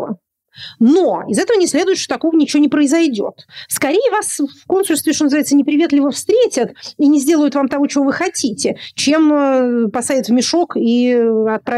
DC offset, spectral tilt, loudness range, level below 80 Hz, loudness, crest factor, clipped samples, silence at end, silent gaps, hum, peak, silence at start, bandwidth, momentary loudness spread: under 0.1%; -3.5 dB/octave; 1 LU; -62 dBFS; -14 LUFS; 12 dB; under 0.1%; 0 s; none; none; -4 dBFS; 0 s; 15.5 kHz; 8 LU